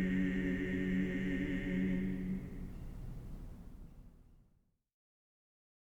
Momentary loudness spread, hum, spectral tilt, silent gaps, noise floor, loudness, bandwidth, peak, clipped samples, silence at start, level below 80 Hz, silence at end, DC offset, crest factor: 18 LU; none; -8 dB/octave; none; -73 dBFS; -37 LUFS; 8 kHz; -24 dBFS; under 0.1%; 0 s; -50 dBFS; 1.45 s; under 0.1%; 14 dB